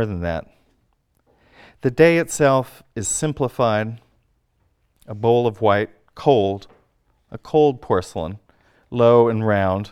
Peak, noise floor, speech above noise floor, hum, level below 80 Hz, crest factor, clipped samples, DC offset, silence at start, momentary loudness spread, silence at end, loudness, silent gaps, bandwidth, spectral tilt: 0 dBFS; -65 dBFS; 47 dB; none; -50 dBFS; 20 dB; under 0.1%; under 0.1%; 0 s; 17 LU; 0.05 s; -19 LUFS; none; 15 kHz; -5.5 dB/octave